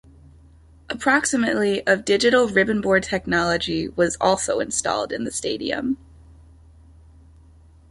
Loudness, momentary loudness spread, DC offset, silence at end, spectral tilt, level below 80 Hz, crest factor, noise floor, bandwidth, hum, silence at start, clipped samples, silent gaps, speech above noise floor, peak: -21 LUFS; 8 LU; under 0.1%; 1.95 s; -3.5 dB/octave; -48 dBFS; 20 dB; -50 dBFS; 11.5 kHz; none; 0.9 s; under 0.1%; none; 29 dB; -4 dBFS